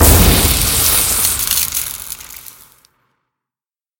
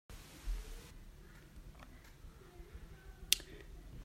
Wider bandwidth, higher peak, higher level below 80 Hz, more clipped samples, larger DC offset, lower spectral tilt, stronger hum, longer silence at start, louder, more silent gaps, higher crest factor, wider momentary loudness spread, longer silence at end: first, over 20 kHz vs 16 kHz; first, 0 dBFS vs -6 dBFS; first, -22 dBFS vs -50 dBFS; neither; neither; first, -2.5 dB/octave vs -1 dB/octave; neither; about the same, 0 s vs 0.1 s; first, -12 LUFS vs -39 LUFS; neither; second, 16 dB vs 40 dB; second, 18 LU vs 24 LU; first, 1.6 s vs 0 s